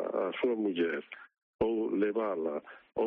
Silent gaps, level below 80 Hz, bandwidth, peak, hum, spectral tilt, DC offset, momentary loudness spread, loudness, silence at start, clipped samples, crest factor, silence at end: 1.43-1.59 s; -64 dBFS; 4.3 kHz; -18 dBFS; none; -4 dB/octave; under 0.1%; 11 LU; -33 LUFS; 0 s; under 0.1%; 14 dB; 0 s